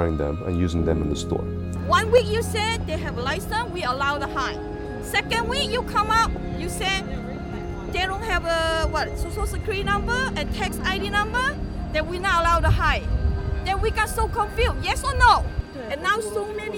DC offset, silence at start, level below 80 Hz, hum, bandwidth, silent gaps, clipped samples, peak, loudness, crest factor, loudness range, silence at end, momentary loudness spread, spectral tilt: under 0.1%; 0 s; -30 dBFS; none; 18 kHz; none; under 0.1%; -2 dBFS; -23 LUFS; 20 dB; 3 LU; 0 s; 10 LU; -4.5 dB/octave